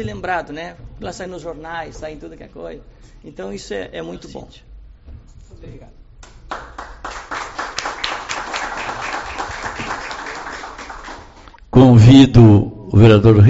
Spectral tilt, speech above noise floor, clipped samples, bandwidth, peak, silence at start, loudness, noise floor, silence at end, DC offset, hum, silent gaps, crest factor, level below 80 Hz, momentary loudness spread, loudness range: -7 dB/octave; 28 dB; under 0.1%; 8 kHz; 0 dBFS; 0 s; -14 LUFS; -41 dBFS; 0 s; under 0.1%; none; none; 16 dB; -36 dBFS; 25 LU; 20 LU